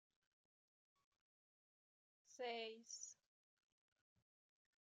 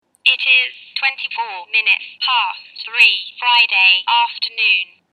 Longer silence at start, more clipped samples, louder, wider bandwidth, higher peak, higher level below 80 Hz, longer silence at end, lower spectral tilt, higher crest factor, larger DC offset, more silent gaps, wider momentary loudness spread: first, 2.3 s vs 0.25 s; neither; second, -52 LUFS vs -14 LUFS; second, 9 kHz vs 14 kHz; second, -38 dBFS vs 0 dBFS; about the same, under -90 dBFS vs -88 dBFS; first, 1.7 s vs 0.3 s; first, 0 dB/octave vs 3 dB/octave; first, 22 dB vs 16 dB; neither; neither; first, 18 LU vs 12 LU